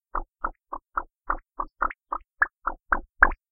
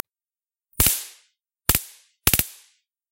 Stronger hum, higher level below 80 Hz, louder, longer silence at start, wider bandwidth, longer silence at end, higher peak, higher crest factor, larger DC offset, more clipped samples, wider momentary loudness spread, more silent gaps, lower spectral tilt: neither; about the same, -38 dBFS vs -38 dBFS; second, -28 LUFS vs -21 LUFS; second, 0.15 s vs 0.8 s; second, 3 kHz vs 17.5 kHz; second, 0.2 s vs 0.6 s; about the same, -2 dBFS vs 0 dBFS; about the same, 28 dB vs 26 dB; neither; neither; second, 14 LU vs 21 LU; neither; first, -9.5 dB/octave vs -2 dB/octave